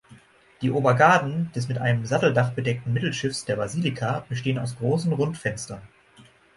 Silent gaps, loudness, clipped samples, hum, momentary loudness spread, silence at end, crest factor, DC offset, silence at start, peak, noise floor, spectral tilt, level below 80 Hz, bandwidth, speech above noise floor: none; -24 LUFS; under 0.1%; none; 11 LU; 0.7 s; 22 dB; under 0.1%; 0.1 s; -2 dBFS; -54 dBFS; -6 dB/octave; -58 dBFS; 11.5 kHz; 30 dB